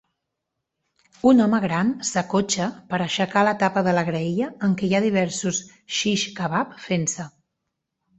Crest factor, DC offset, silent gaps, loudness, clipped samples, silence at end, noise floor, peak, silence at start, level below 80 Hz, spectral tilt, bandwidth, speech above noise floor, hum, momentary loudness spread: 18 dB; under 0.1%; none; -22 LUFS; under 0.1%; 0.9 s; -81 dBFS; -4 dBFS; 1.25 s; -60 dBFS; -4.5 dB/octave; 8.2 kHz; 59 dB; none; 8 LU